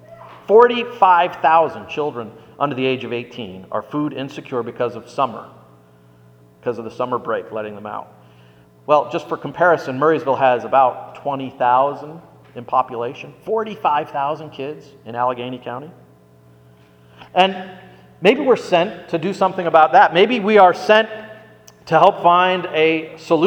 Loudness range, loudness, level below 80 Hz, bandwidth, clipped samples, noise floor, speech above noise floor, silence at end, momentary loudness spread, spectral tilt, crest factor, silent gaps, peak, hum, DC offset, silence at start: 12 LU; -17 LUFS; -64 dBFS; 9.6 kHz; under 0.1%; -49 dBFS; 32 dB; 0 s; 19 LU; -6 dB/octave; 18 dB; none; 0 dBFS; none; under 0.1%; 0.1 s